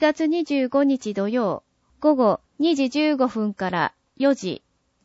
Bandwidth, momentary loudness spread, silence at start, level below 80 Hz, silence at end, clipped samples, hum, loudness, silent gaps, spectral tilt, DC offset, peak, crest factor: 8 kHz; 7 LU; 0 s; -66 dBFS; 0.45 s; under 0.1%; none; -22 LUFS; none; -5.5 dB/octave; under 0.1%; -6 dBFS; 16 dB